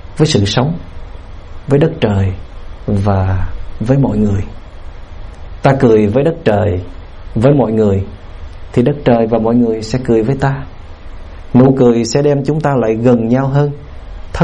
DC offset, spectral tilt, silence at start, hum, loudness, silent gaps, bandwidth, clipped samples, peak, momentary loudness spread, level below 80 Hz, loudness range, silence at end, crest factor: under 0.1%; -7.5 dB/octave; 0.05 s; none; -13 LUFS; none; 10 kHz; under 0.1%; 0 dBFS; 23 LU; -30 dBFS; 4 LU; 0 s; 14 dB